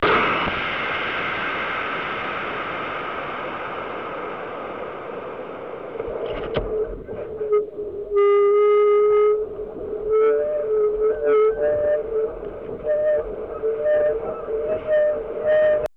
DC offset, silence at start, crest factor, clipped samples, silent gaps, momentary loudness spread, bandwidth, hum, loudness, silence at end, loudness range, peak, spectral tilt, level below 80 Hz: 0.2%; 0 s; 12 dB; under 0.1%; none; 15 LU; 5.4 kHz; none; -22 LUFS; 0.1 s; 10 LU; -10 dBFS; -6.5 dB/octave; -46 dBFS